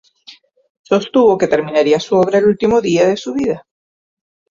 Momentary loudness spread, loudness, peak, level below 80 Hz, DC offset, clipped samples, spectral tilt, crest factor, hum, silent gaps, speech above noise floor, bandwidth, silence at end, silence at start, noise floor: 7 LU; -14 LUFS; -2 dBFS; -52 dBFS; under 0.1%; under 0.1%; -5.5 dB/octave; 14 dB; none; 0.70-0.84 s; 31 dB; 7.6 kHz; 0.9 s; 0.3 s; -44 dBFS